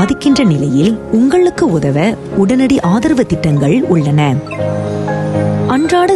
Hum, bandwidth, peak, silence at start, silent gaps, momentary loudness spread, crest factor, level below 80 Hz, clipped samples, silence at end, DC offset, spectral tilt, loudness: none; 12 kHz; -2 dBFS; 0 s; none; 6 LU; 10 dB; -38 dBFS; under 0.1%; 0 s; 0.1%; -7 dB/octave; -12 LUFS